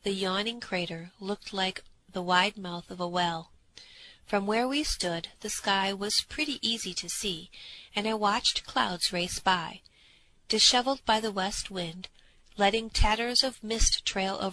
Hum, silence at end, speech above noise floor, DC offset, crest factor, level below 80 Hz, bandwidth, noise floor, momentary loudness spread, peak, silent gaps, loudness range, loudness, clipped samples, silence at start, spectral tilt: none; 0 s; 31 dB; under 0.1%; 22 dB; -42 dBFS; 14 kHz; -60 dBFS; 13 LU; -8 dBFS; none; 4 LU; -28 LUFS; under 0.1%; 0.05 s; -2.5 dB/octave